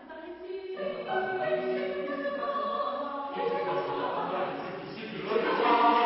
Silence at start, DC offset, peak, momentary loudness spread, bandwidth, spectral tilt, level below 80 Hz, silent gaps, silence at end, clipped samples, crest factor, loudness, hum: 0 s; under 0.1%; -12 dBFS; 12 LU; 5.8 kHz; -8.5 dB/octave; -70 dBFS; none; 0 s; under 0.1%; 18 dB; -31 LUFS; none